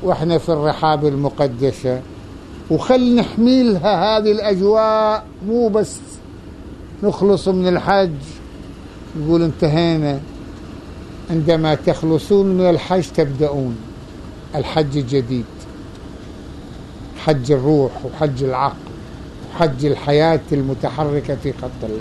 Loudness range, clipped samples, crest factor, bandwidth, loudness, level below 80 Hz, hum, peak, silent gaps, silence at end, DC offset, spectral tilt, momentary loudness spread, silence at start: 6 LU; under 0.1%; 16 dB; 12 kHz; -17 LUFS; -40 dBFS; none; -2 dBFS; none; 0 s; under 0.1%; -7 dB/octave; 20 LU; 0 s